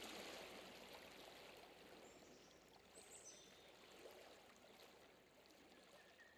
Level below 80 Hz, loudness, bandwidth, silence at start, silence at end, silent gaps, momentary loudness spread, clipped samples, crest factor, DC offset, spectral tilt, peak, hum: -86 dBFS; -61 LUFS; over 20 kHz; 0 s; 0 s; none; 11 LU; under 0.1%; 22 dB; under 0.1%; -2 dB/octave; -40 dBFS; none